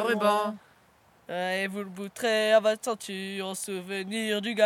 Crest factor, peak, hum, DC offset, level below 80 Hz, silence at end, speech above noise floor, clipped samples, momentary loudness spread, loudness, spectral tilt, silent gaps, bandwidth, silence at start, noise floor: 20 dB; -10 dBFS; none; under 0.1%; -76 dBFS; 0 s; 33 dB; under 0.1%; 12 LU; -28 LUFS; -3.5 dB/octave; none; 17 kHz; 0 s; -61 dBFS